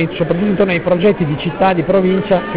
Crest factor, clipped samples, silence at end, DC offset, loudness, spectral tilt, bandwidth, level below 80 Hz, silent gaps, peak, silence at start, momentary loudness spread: 12 dB; under 0.1%; 0 s; 0.8%; -14 LUFS; -11 dB/octave; 4 kHz; -40 dBFS; none; -2 dBFS; 0 s; 4 LU